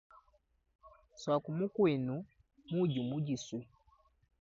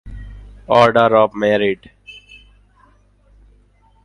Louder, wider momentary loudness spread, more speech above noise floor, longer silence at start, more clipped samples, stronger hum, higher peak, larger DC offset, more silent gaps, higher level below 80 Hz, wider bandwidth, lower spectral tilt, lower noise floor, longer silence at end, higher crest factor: second, -36 LUFS vs -14 LUFS; second, 13 LU vs 25 LU; about the same, 39 dB vs 39 dB; first, 0.85 s vs 0.05 s; neither; second, none vs 50 Hz at -50 dBFS; second, -20 dBFS vs 0 dBFS; neither; neither; second, -72 dBFS vs -42 dBFS; second, 7.4 kHz vs 10.5 kHz; about the same, -7 dB/octave vs -6 dB/octave; first, -73 dBFS vs -53 dBFS; second, 0.75 s vs 1.95 s; about the same, 18 dB vs 18 dB